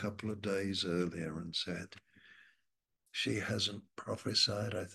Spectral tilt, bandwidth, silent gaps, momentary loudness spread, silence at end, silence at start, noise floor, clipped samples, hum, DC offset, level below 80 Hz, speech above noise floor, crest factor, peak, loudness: -4 dB/octave; 12.5 kHz; none; 13 LU; 0 s; 0 s; -84 dBFS; under 0.1%; none; under 0.1%; -70 dBFS; 47 dB; 20 dB; -18 dBFS; -36 LUFS